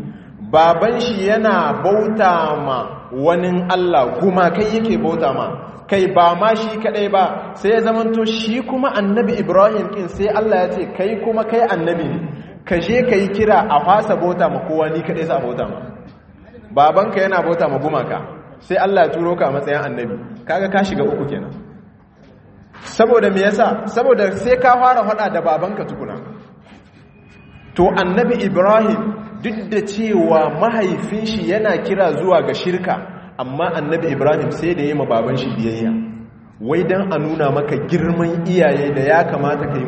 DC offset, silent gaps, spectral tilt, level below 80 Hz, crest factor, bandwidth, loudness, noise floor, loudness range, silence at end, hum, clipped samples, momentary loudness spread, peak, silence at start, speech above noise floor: under 0.1%; none; -7 dB/octave; -48 dBFS; 16 dB; 8.4 kHz; -16 LUFS; -45 dBFS; 3 LU; 0 s; none; under 0.1%; 12 LU; 0 dBFS; 0 s; 29 dB